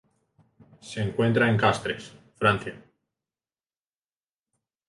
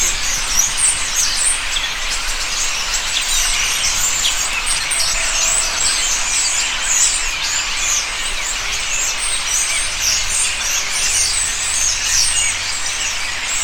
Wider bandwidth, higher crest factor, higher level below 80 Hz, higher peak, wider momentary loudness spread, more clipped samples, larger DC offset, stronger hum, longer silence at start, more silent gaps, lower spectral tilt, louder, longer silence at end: second, 11.5 kHz vs 19 kHz; first, 22 dB vs 16 dB; second, -58 dBFS vs -30 dBFS; second, -6 dBFS vs -2 dBFS; first, 17 LU vs 5 LU; neither; neither; neither; first, 0.85 s vs 0 s; neither; first, -6 dB/octave vs 1.5 dB/octave; second, -24 LUFS vs -15 LUFS; first, 2.1 s vs 0 s